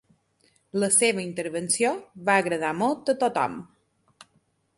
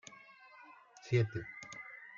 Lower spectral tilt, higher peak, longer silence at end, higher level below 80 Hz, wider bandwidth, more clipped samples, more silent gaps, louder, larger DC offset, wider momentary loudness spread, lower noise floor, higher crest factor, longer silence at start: second, -3 dB/octave vs -6.5 dB/octave; first, -6 dBFS vs -20 dBFS; first, 1.15 s vs 0 s; about the same, -70 dBFS vs -72 dBFS; first, 12 kHz vs 7.4 kHz; neither; neither; first, -24 LUFS vs -38 LUFS; neither; second, 10 LU vs 23 LU; first, -68 dBFS vs -59 dBFS; about the same, 20 dB vs 20 dB; first, 0.75 s vs 0.1 s